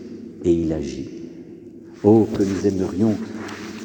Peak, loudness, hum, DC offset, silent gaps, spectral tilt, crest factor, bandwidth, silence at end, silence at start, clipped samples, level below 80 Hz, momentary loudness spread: -4 dBFS; -21 LUFS; none; under 0.1%; none; -7.5 dB/octave; 18 dB; 17 kHz; 0 s; 0 s; under 0.1%; -46 dBFS; 22 LU